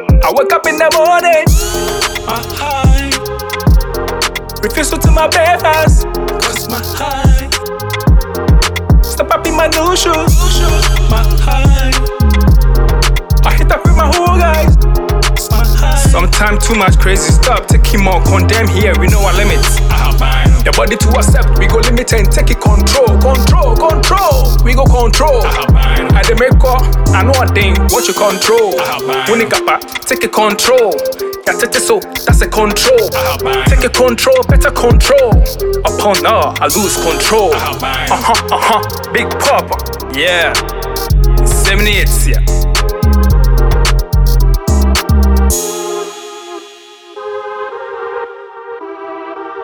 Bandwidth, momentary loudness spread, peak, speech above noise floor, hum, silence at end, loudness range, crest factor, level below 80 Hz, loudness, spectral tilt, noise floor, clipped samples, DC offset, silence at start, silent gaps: 20 kHz; 8 LU; 0 dBFS; 26 dB; none; 0 s; 3 LU; 8 dB; -12 dBFS; -11 LUFS; -4.5 dB/octave; -35 dBFS; under 0.1%; under 0.1%; 0 s; none